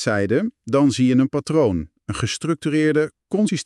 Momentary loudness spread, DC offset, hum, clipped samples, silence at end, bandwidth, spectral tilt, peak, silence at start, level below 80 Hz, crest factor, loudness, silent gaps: 7 LU; under 0.1%; none; under 0.1%; 0 s; 12 kHz; -6 dB/octave; -6 dBFS; 0 s; -48 dBFS; 14 dB; -20 LUFS; none